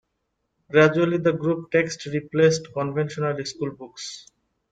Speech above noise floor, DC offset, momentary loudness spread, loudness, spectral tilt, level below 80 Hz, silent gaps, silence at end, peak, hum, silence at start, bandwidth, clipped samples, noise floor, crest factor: 54 dB; under 0.1%; 17 LU; -23 LUFS; -5.5 dB/octave; -62 dBFS; none; 0.5 s; -4 dBFS; none; 0.7 s; 9.2 kHz; under 0.1%; -76 dBFS; 20 dB